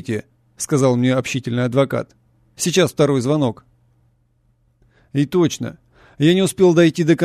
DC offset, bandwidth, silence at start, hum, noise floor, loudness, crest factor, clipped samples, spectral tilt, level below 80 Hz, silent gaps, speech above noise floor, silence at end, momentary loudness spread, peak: under 0.1%; 14 kHz; 0.05 s; none; -61 dBFS; -18 LUFS; 16 dB; under 0.1%; -5.5 dB/octave; -56 dBFS; none; 44 dB; 0 s; 13 LU; -2 dBFS